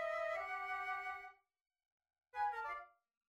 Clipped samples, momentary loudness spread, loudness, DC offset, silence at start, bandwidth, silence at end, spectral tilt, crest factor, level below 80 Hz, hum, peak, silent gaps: under 0.1%; 11 LU; -43 LUFS; under 0.1%; 0 s; 16 kHz; 0.4 s; -2 dB/octave; 16 dB; -78 dBFS; none; -30 dBFS; 1.61-1.65 s, 1.85-1.98 s